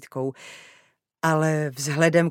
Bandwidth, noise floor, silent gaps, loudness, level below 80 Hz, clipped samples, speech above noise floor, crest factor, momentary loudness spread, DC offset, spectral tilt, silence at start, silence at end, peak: 16.5 kHz; -47 dBFS; none; -23 LUFS; -74 dBFS; under 0.1%; 24 dB; 22 dB; 17 LU; under 0.1%; -5.5 dB/octave; 0 s; 0 s; -2 dBFS